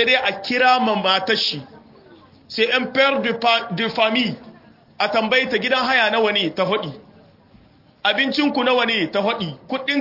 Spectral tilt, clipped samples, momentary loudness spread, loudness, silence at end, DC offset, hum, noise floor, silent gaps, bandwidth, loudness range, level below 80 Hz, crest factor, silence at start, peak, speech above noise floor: -4.5 dB/octave; under 0.1%; 9 LU; -18 LUFS; 0 s; under 0.1%; none; -51 dBFS; none; 5.8 kHz; 2 LU; -64 dBFS; 16 dB; 0 s; -4 dBFS; 32 dB